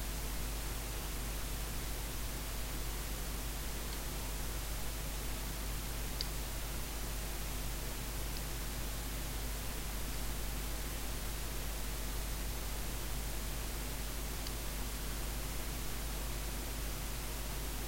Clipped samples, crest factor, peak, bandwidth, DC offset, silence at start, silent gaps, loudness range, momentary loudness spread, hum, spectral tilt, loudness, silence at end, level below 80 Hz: under 0.1%; 20 dB; -20 dBFS; 16 kHz; under 0.1%; 0 s; none; 0 LU; 0 LU; none; -3.5 dB/octave; -41 LUFS; 0 s; -42 dBFS